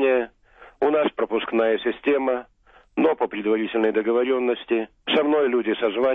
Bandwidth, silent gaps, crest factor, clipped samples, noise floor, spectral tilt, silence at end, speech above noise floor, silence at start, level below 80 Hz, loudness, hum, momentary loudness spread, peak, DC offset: 3.9 kHz; none; 12 dB; under 0.1%; -50 dBFS; -7.5 dB/octave; 0 s; 29 dB; 0 s; -60 dBFS; -22 LUFS; none; 5 LU; -10 dBFS; under 0.1%